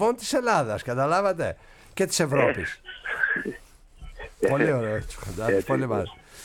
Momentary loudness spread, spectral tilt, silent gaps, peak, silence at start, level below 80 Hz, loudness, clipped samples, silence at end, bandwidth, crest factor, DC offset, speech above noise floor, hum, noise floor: 14 LU; -4.5 dB/octave; none; -8 dBFS; 0 s; -48 dBFS; -25 LUFS; under 0.1%; 0 s; 18 kHz; 18 dB; under 0.1%; 20 dB; none; -45 dBFS